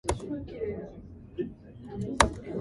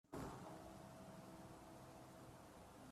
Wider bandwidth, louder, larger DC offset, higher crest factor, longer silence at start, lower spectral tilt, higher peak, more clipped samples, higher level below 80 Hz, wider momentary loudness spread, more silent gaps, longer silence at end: second, 12 kHz vs 15.5 kHz; first, -32 LUFS vs -58 LUFS; neither; first, 32 dB vs 18 dB; about the same, 0.05 s vs 0.05 s; second, -4 dB/octave vs -5.5 dB/octave; first, 0 dBFS vs -40 dBFS; neither; first, -42 dBFS vs -72 dBFS; first, 19 LU vs 7 LU; neither; about the same, 0 s vs 0 s